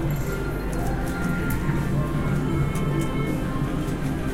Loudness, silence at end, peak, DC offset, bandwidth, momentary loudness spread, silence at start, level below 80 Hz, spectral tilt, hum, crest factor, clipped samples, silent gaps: -26 LUFS; 0 s; -12 dBFS; under 0.1%; 16.5 kHz; 3 LU; 0 s; -32 dBFS; -7 dB/octave; none; 12 dB; under 0.1%; none